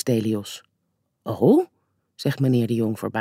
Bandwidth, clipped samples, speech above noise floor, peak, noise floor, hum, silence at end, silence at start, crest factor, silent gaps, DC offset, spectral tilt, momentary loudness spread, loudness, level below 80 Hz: 16 kHz; under 0.1%; 53 dB; -6 dBFS; -74 dBFS; none; 0 s; 0.05 s; 18 dB; none; under 0.1%; -7 dB/octave; 18 LU; -22 LUFS; -70 dBFS